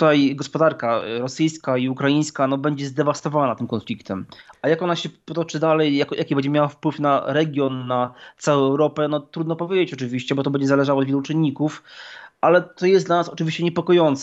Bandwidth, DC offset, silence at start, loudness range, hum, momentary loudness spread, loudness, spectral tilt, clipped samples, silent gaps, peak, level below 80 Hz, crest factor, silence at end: 8.2 kHz; under 0.1%; 0 s; 2 LU; none; 9 LU; -21 LUFS; -6 dB/octave; under 0.1%; none; -4 dBFS; -70 dBFS; 18 dB; 0 s